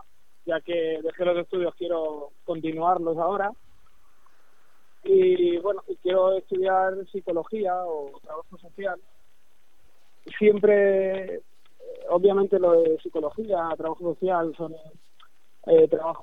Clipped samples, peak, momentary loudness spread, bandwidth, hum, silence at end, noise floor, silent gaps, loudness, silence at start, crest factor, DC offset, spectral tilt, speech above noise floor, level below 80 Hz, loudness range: under 0.1%; -6 dBFS; 18 LU; 4 kHz; none; 0 s; -67 dBFS; none; -24 LUFS; 0.45 s; 18 dB; 0.6%; -8 dB/octave; 43 dB; -68 dBFS; 6 LU